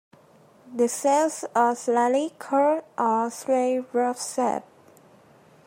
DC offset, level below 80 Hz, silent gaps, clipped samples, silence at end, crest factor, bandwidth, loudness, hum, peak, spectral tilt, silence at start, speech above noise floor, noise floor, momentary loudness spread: under 0.1%; -82 dBFS; none; under 0.1%; 1.05 s; 16 dB; 16 kHz; -24 LUFS; none; -8 dBFS; -3.5 dB/octave; 0.65 s; 31 dB; -55 dBFS; 5 LU